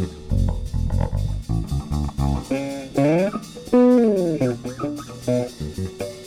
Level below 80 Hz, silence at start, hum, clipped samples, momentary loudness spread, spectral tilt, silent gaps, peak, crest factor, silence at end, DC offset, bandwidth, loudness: -30 dBFS; 0 s; none; under 0.1%; 12 LU; -7.5 dB/octave; none; -8 dBFS; 14 dB; 0 s; under 0.1%; 15.5 kHz; -22 LUFS